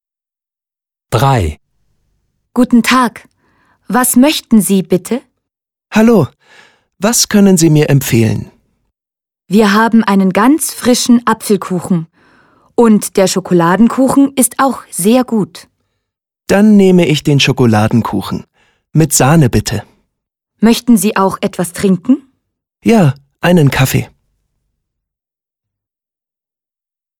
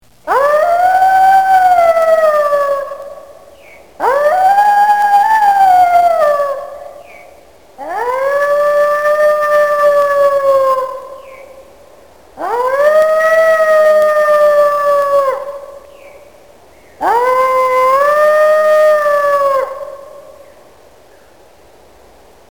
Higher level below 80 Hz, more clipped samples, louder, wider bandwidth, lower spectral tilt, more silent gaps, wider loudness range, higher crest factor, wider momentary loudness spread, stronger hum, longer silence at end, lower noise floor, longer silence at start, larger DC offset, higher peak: first, -38 dBFS vs -54 dBFS; neither; about the same, -11 LUFS vs -11 LUFS; about the same, 18.5 kHz vs 17.5 kHz; first, -5 dB/octave vs -2.5 dB/octave; neither; about the same, 3 LU vs 4 LU; about the same, 12 dB vs 12 dB; second, 9 LU vs 14 LU; neither; first, 3.15 s vs 2.3 s; first, -89 dBFS vs -44 dBFS; first, 1.1 s vs 0.25 s; second, under 0.1% vs 0.7%; about the same, 0 dBFS vs 0 dBFS